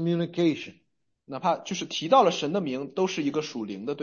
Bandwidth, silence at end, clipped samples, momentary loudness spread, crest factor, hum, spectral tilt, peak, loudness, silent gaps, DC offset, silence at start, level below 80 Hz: 7.4 kHz; 0 s; under 0.1%; 13 LU; 20 dB; none; -5.5 dB/octave; -8 dBFS; -27 LUFS; none; under 0.1%; 0 s; -74 dBFS